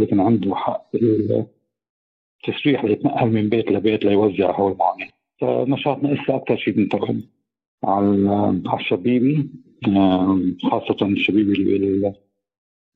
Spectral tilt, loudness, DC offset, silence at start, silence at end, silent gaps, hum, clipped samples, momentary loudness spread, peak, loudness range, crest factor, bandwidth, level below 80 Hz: -10 dB/octave; -20 LUFS; under 0.1%; 0 s; 0.8 s; 1.89-2.39 s, 7.67-7.78 s; none; under 0.1%; 8 LU; -6 dBFS; 2 LU; 14 dB; 4.5 kHz; -60 dBFS